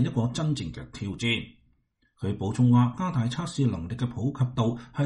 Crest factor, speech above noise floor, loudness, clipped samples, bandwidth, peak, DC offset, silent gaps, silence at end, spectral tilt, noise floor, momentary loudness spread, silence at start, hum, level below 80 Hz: 16 dB; 42 dB; -27 LUFS; under 0.1%; 10.5 kHz; -10 dBFS; under 0.1%; none; 0 s; -6.5 dB/octave; -69 dBFS; 13 LU; 0 s; none; -52 dBFS